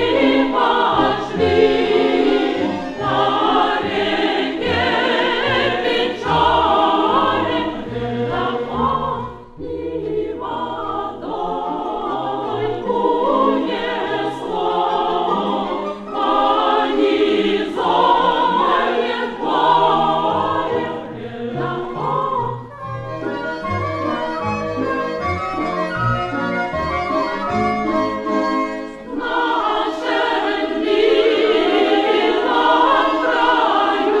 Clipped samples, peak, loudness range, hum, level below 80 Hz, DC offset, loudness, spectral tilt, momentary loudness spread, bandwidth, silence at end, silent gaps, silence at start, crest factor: under 0.1%; -2 dBFS; 7 LU; none; -44 dBFS; under 0.1%; -18 LUFS; -6 dB/octave; 9 LU; 9.8 kHz; 0 s; none; 0 s; 16 dB